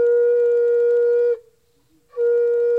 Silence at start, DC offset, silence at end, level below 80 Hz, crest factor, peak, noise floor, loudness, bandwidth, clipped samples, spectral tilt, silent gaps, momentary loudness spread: 0 s; under 0.1%; 0 s; -70 dBFS; 6 dB; -12 dBFS; -61 dBFS; -18 LUFS; 2.5 kHz; under 0.1%; -4.5 dB/octave; none; 7 LU